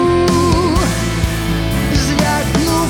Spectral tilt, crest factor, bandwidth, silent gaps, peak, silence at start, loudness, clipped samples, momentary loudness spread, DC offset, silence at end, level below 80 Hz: -5 dB/octave; 12 dB; 19.5 kHz; none; -2 dBFS; 0 s; -15 LUFS; under 0.1%; 5 LU; under 0.1%; 0 s; -24 dBFS